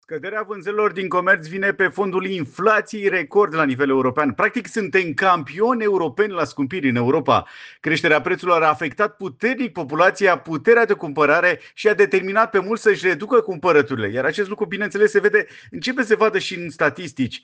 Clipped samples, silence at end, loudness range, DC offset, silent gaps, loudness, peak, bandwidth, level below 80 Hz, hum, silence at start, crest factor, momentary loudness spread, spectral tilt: under 0.1%; 0.05 s; 2 LU; under 0.1%; none; -19 LUFS; -4 dBFS; 9.2 kHz; -64 dBFS; none; 0.1 s; 16 dB; 8 LU; -5.5 dB/octave